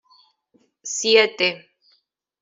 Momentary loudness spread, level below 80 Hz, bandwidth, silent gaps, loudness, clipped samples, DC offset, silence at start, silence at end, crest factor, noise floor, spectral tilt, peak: 21 LU; -74 dBFS; 7.8 kHz; none; -19 LUFS; under 0.1%; under 0.1%; 0.85 s; 0.85 s; 20 dB; -66 dBFS; -1 dB/octave; -4 dBFS